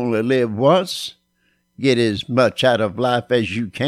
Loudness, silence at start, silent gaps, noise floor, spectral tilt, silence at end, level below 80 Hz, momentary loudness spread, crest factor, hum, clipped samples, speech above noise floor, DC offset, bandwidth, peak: -18 LUFS; 0 s; none; -65 dBFS; -5.5 dB/octave; 0 s; -56 dBFS; 8 LU; 16 dB; none; under 0.1%; 48 dB; under 0.1%; 15 kHz; -4 dBFS